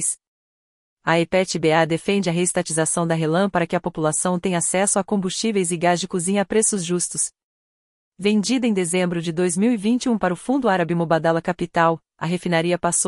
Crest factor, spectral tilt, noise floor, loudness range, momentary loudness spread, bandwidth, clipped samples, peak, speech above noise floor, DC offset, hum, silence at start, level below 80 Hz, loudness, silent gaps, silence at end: 18 dB; -4 dB/octave; under -90 dBFS; 2 LU; 4 LU; 11.5 kHz; under 0.1%; -4 dBFS; over 70 dB; under 0.1%; none; 0 s; -56 dBFS; -21 LUFS; 0.27-0.97 s, 7.43-8.12 s; 0 s